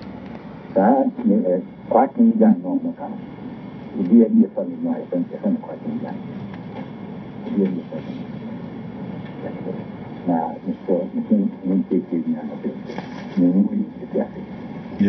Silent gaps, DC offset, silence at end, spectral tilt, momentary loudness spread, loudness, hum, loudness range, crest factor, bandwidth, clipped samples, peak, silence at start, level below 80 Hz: none; under 0.1%; 0 s; -9 dB/octave; 17 LU; -21 LUFS; none; 9 LU; 18 dB; 5.6 kHz; under 0.1%; -4 dBFS; 0 s; -58 dBFS